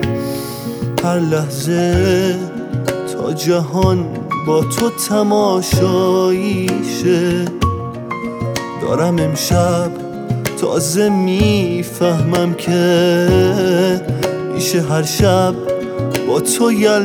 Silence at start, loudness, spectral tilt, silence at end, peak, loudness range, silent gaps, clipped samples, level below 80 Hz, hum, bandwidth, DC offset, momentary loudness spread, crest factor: 0 s; -16 LUFS; -5.5 dB/octave; 0 s; 0 dBFS; 3 LU; none; under 0.1%; -38 dBFS; none; over 20 kHz; under 0.1%; 9 LU; 14 dB